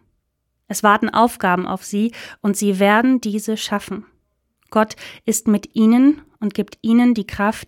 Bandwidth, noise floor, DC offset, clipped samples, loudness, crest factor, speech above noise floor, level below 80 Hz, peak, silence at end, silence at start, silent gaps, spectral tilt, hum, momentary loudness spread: 17 kHz; -72 dBFS; under 0.1%; under 0.1%; -18 LUFS; 18 dB; 54 dB; -52 dBFS; 0 dBFS; 0.05 s; 0.7 s; none; -5 dB/octave; none; 10 LU